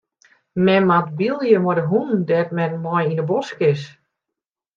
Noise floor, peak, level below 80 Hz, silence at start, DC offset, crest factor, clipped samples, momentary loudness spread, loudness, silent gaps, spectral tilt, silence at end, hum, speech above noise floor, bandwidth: -85 dBFS; -2 dBFS; -62 dBFS; 0.55 s; under 0.1%; 18 dB; under 0.1%; 7 LU; -19 LUFS; none; -8 dB/octave; 0.85 s; none; 66 dB; 7.2 kHz